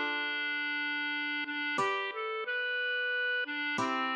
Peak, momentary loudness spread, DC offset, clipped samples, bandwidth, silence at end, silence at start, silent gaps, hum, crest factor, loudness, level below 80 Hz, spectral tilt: -20 dBFS; 3 LU; under 0.1%; under 0.1%; 10 kHz; 0 s; 0 s; none; none; 14 dB; -32 LUFS; -88 dBFS; -3 dB/octave